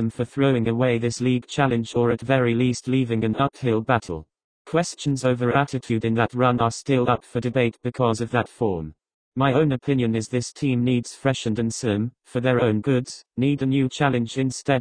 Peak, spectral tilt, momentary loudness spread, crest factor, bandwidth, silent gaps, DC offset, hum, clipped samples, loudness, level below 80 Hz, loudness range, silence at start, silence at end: -4 dBFS; -6.5 dB/octave; 5 LU; 20 dB; 10 kHz; 4.44-4.65 s, 9.14-9.32 s; under 0.1%; none; under 0.1%; -23 LUFS; -52 dBFS; 2 LU; 0 s; 0 s